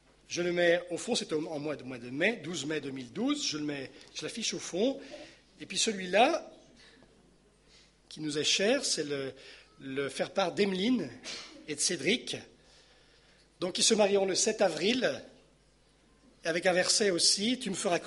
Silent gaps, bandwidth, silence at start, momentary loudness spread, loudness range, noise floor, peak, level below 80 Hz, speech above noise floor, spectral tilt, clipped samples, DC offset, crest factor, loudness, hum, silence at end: none; 11.5 kHz; 0.3 s; 15 LU; 4 LU; -65 dBFS; -10 dBFS; -70 dBFS; 34 dB; -2.5 dB/octave; under 0.1%; under 0.1%; 22 dB; -30 LUFS; none; 0 s